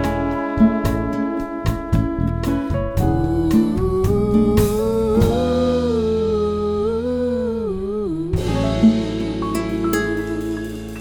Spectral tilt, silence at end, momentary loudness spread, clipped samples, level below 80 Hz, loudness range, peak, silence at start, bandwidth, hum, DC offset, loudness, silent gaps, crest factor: -7.5 dB/octave; 0 s; 7 LU; under 0.1%; -30 dBFS; 3 LU; -2 dBFS; 0 s; 20 kHz; none; under 0.1%; -20 LUFS; none; 16 dB